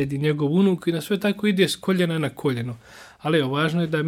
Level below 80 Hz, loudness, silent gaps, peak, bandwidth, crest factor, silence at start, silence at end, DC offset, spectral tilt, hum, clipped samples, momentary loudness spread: -60 dBFS; -22 LUFS; none; -4 dBFS; 16 kHz; 18 dB; 0 s; 0 s; under 0.1%; -6 dB/octave; none; under 0.1%; 8 LU